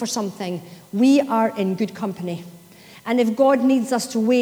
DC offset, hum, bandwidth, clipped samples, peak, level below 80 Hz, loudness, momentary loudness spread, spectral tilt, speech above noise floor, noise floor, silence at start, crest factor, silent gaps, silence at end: under 0.1%; none; over 20 kHz; under 0.1%; -6 dBFS; -70 dBFS; -20 LUFS; 14 LU; -5.5 dB/octave; 26 dB; -46 dBFS; 0 s; 14 dB; none; 0 s